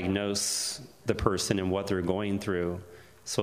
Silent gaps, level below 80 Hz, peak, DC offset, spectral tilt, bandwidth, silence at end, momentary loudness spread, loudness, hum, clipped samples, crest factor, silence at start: none; -50 dBFS; -6 dBFS; under 0.1%; -4 dB/octave; 15.5 kHz; 0 s; 7 LU; -30 LUFS; none; under 0.1%; 24 dB; 0 s